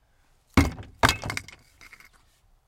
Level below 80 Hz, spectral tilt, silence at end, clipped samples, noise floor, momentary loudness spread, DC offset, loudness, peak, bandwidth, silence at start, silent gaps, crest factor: -40 dBFS; -4.5 dB/octave; 1.25 s; under 0.1%; -63 dBFS; 10 LU; under 0.1%; -26 LUFS; -4 dBFS; 17 kHz; 0.55 s; none; 24 dB